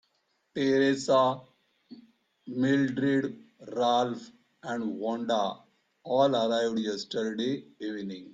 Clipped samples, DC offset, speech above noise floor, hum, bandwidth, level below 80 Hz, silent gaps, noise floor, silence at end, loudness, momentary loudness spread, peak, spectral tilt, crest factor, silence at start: under 0.1%; under 0.1%; 46 dB; none; 9.2 kHz; -74 dBFS; none; -74 dBFS; 0 s; -28 LUFS; 15 LU; -12 dBFS; -5.5 dB/octave; 18 dB; 0.55 s